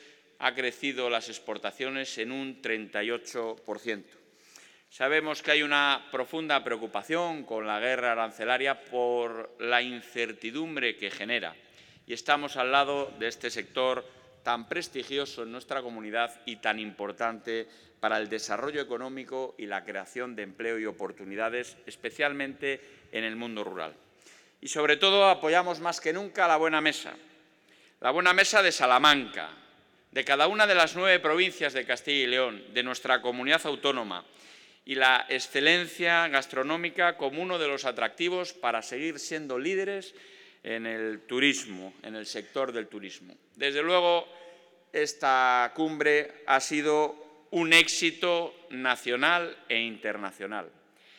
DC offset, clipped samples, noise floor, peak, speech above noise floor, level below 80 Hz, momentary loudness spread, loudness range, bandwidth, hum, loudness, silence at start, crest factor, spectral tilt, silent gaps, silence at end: under 0.1%; under 0.1%; -61 dBFS; -6 dBFS; 33 dB; -80 dBFS; 15 LU; 9 LU; 18.5 kHz; none; -28 LUFS; 0.4 s; 22 dB; -2 dB/octave; none; 0.5 s